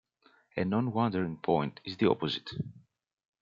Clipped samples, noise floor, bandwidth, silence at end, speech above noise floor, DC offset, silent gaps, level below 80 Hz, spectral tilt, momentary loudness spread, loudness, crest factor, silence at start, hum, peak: under 0.1%; -66 dBFS; 7.4 kHz; 0.65 s; 36 dB; under 0.1%; none; -68 dBFS; -8 dB/octave; 11 LU; -31 LUFS; 22 dB; 0.55 s; none; -12 dBFS